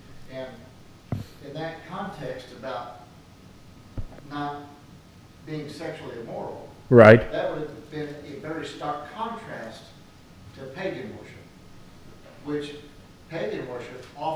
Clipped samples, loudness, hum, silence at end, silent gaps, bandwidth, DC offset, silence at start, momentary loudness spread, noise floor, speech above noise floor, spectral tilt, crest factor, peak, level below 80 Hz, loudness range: under 0.1%; -25 LUFS; none; 0 s; none; 13 kHz; under 0.1%; 0.1 s; 17 LU; -49 dBFS; 24 dB; -7.5 dB/octave; 26 dB; 0 dBFS; -50 dBFS; 17 LU